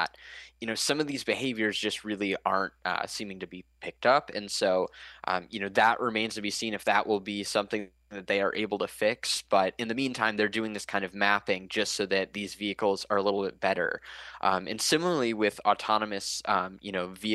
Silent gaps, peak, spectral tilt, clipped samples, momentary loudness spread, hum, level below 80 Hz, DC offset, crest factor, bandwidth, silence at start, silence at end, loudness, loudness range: none; -8 dBFS; -3 dB/octave; under 0.1%; 9 LU; none; -66 dBFS; under 0.1%; 20 dB; 12.5 kHz; 0 s; 0 s; -29 LUFS; 2 LU